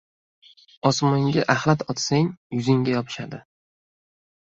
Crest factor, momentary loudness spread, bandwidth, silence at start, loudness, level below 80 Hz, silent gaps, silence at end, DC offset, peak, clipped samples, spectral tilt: 22 dB; 12 LU; 7.8 kHz; 0.85 s; -22 LUFS; -60 dBFS; 2.37-2.50 s; 1.1 s; under 0.1%; -2 dBFS; under 0.1%; -5.5 dB/octave